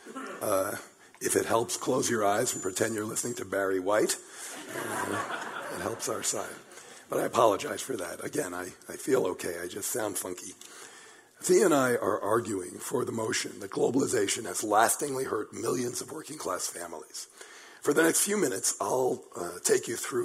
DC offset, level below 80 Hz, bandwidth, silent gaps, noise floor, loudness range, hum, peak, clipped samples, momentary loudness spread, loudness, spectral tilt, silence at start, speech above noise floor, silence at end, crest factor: under 0.1%; -72 dBFS; 16 kHz; none; -52 dBFS; 4 LU; none; -8 dBFS; under 0.1%; 15 LU; -29 LUFS; -3 dB/octave; 0 s; 23 dB; 0 s; 22 dB